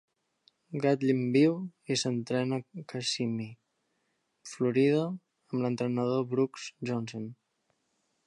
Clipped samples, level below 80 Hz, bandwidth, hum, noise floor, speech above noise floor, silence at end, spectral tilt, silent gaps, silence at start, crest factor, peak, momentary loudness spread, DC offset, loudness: under 0.1%; -78 dBFS; 11 kHz; none; -78 dBFS; 48 dB; 0.95 s; -5.5 dB/octave; none; 0.7 s; 18 dB; -14 dBFS; 15 LU; under 0.1%; -30 LUFS